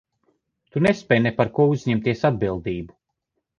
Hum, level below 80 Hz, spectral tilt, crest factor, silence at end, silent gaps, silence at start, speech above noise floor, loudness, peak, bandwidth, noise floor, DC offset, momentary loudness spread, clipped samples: none; -50 dBFS; -7.5 dB/octave; 20 dB; 0.7 s; none; 0.75 s; 57 dB; -22 LUFS; -4 dBFS; 10 kHz; -78 dBFS; under 0.1%; 11 LU; under 0.1%